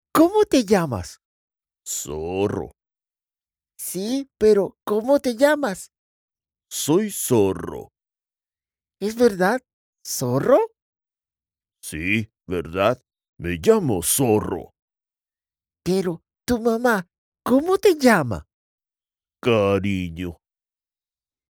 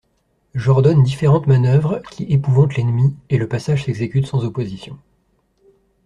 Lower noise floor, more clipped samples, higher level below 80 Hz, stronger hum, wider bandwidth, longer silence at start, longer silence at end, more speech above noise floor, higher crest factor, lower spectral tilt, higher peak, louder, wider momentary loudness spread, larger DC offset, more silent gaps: first, under -90 dBFS vs -64 dBFS; neither; about the same, -50 dBFS vs -48 dBFS; neither; first, over 20 kHz vs 9.6 kHz; second, 0.15 s vs 0.55 s; about the same, 1.15 s vs 1.1 s; first, over 70 dB vs 48 dB; first, 20 dB vs 14 dB; second, -5 dB/octave vs -8.5 dB/octave; about the same, -4 dBFS vs -2 dBFS; second, -21 LUFS vs -17 LUFS; first, 15 LU vs 12 LU; neither; first, 1.25-1.48 s, 5.98-6.28 s, 9.73-9.93 s, 10.82-10.93 s, 13.29-13.33 s, 14.82-14.88 s, 17.18-17.32 s, 18.54-18.78 s vs none